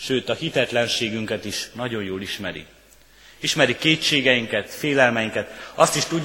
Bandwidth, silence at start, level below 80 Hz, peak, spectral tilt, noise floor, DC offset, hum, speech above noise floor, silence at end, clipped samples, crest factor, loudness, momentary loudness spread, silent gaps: 17 kHz; 0 s; -56 dBFS; 0 dBFS; -3.5 dB/octave; -51 dBFS; under 0.1%; none; 29 dB; 0 s; under 0.1%; 22 dB; -21 LUFS; 11 LU; none